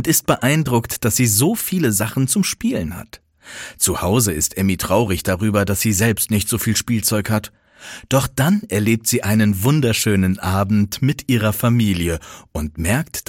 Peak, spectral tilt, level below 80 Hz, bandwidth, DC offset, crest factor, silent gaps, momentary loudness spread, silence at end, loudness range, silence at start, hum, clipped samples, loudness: 0 dBFS; -4.5 dB/octave; -40 dBFS; 17 kHz; under 0.1%; 18 dB; none; 8 LU; 0.05 s; 2 LU; 0 s; none; under 0.1%; -18 LUFS